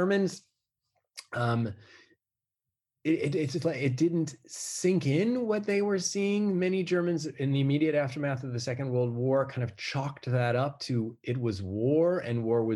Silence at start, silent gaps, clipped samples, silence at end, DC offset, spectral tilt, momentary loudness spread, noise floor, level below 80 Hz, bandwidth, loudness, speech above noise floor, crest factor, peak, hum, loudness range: 0 s; none; under 0.1%; 0 s; under 0.1%; -6 dB/octave; 7 LU; under -90 dBFS; -72 dBFS; 12.5 kHz; -29 LUFS; over 61 dB; 14 dB; -14 dBFS; none; 4 LU